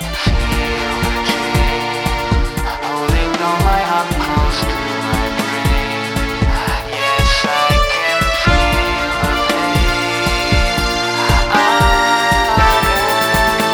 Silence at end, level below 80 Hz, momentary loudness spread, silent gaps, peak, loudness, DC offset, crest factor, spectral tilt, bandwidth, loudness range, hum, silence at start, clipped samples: 0 s; -20 dBFS; 6 LU; none; 0 dBFS; -15 LUFS; under 0.1%; 14 dB; -4 dB/octave; over 20 kHz; 4 LU; none; 0 s; under 0.1%